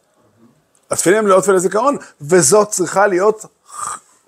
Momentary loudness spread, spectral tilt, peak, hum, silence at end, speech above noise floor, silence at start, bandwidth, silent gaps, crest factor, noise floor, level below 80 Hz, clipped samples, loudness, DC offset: 15 LU; -4 dB/octave; 0 dBFS; none; 0.3 s; 39 dB; 0.9 s; 16 kHz; none; 16 dB; -53 dBFS; -62 dBFS; under 0.1%; -14 LUFS; under 0.1%